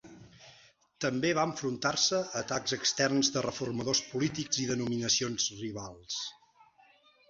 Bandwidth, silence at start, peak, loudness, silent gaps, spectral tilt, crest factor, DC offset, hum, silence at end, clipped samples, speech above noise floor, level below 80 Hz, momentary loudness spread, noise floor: 7.8 kHz; 0.05 s; -12 dBFS; -31 LUFS; none; -3 dB/octave; 20 dB; under 0.1%; none; 0.95 s; under 0.1%; 32 dB; -66 dBFS; 10 LU; -63 dBFS